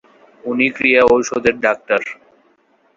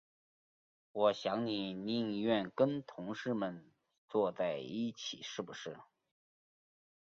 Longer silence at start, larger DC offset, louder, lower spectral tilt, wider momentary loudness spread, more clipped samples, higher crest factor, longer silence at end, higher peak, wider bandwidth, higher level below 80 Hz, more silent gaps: second, 0.45 s vs 0.95 s; neither; first, -15 LUFS vs -37 LUFS; about the same, -4 dB/octave vs -4 dB/octave; about the same, 13 LU vs 12 LU; neither; about the same, 18 dB vs 22 dB; second, 0.85 s vs 1.35 s; first, 0 dBFS vs -18 dBFS; about the same, 7.6 kHz vs 7.4 kHz; first, -50 dBFS vs -78 dBFS; second, none vs 3.98-4.08 s